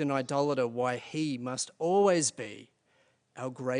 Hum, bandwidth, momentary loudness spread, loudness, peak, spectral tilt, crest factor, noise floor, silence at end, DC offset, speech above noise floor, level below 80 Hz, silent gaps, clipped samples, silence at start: none; 10.5 kHz; 16 LU; -30 LUFS; -12 dBFS; -4.5 dB/octave; 18 dB; -70 dBFS; 0 s; under 0.1%; 40 dB; -78 dBFS; none; under 0.1%; 0 s